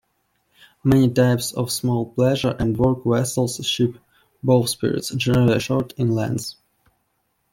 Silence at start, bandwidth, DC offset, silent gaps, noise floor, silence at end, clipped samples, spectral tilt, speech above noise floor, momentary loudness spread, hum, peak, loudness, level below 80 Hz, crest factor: 0.85 s; 17 kHz; under 0.1%; none; -70 dBFS; 1 s; under 0.1%; -5.5 dB/octave; 51 dB; 7 LU; none; -4 dBFS; -20 LUFS; -48 dBFS; 18 dB